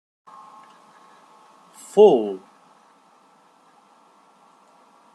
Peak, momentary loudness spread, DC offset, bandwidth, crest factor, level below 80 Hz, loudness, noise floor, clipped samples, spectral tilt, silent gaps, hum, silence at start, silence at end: -2 dBFS; 30 LU; under 0.1%; 11.5 kHz; 22 dB; -78 dBFS; -17 LUFS; -56 dBFS; under 0.1%; -6 dB/octave; none; none; 1.95 s; 2.75 s